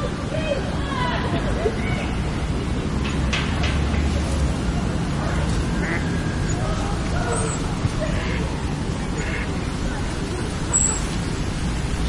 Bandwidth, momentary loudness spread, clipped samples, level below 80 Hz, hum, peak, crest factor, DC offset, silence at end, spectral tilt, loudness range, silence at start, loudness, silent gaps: 11.5 kHz; 4 LU; under 0.1%; -28 dBFS; none; -6 dBFS; 16 dB; under 0.1%; 0 s; -5 dB/octave; 2 LU; 0 s; -24 LUFS; none